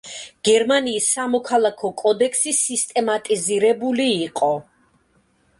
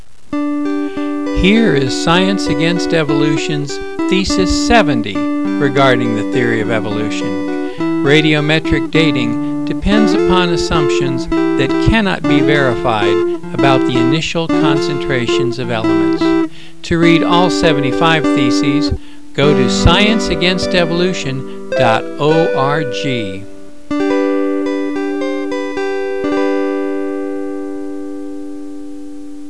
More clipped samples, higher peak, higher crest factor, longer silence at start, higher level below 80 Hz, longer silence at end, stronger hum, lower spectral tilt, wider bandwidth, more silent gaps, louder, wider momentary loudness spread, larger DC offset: neither; second, -4 dBFS vs 0 dBFS; about the same, 16 dB vs 14 dB; second, 0.05 s vs 0.3 s; second, -66 dBFS vs -32 dBFS; first, 0.95 s vs 0 s; neither; second, -2 dB/octave vs -5.5 dB/octave; about the same, 11.5 kHz vs 11 kHz; neither; second, -19 LUFS vs -14 LUFS; second, 5 LU vs 11 LU; second, under 0.1% vs 5%